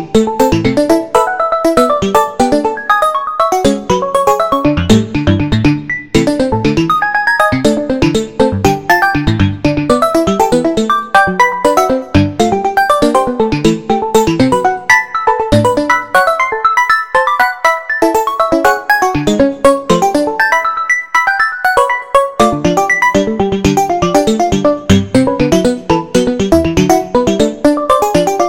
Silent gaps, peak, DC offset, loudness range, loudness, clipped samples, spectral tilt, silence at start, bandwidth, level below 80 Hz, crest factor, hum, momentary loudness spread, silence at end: none; 0 dBFS; 1%; 1 LU; -11 LUFS; 0.2%; -5.5 dB/octave; 0 s; 17 kHz; -32 dBFS; 12 dB; none; 3 LU; 0 s